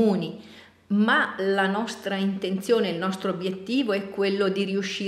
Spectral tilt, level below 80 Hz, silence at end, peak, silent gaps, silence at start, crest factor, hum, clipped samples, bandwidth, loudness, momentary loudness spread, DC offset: -5.5 dB/octave; -72 dBFS; 0 s; -8 dBFS; none; 0 s; 16 dB; none; under 0.1%; 14 kHz; -25 LUFS; 7 LU; under 0.1%